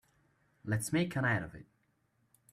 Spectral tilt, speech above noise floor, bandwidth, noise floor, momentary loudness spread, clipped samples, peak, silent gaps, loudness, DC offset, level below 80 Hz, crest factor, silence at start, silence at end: -5.5 dB/octave; 42 dB; 15 kHz; -75 dBFS; 15 LU; under 0.1%; -18 dBFS; none; -34 LUFS; under 0.1%; -66 dBFS; 20 dB; 0.65 s; 0.9 s